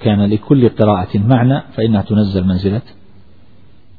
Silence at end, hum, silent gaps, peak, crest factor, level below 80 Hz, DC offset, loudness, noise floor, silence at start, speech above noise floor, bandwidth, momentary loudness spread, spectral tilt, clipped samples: 1.2 s; none; none; 0 dBFS; 14 dB; -44 dBFS; 1%; -14 LUFS; -47 dBFS; 0 s; 34 dB; 4.9 kHz; 5 LU; -11.5 dB/octave; under 0.1%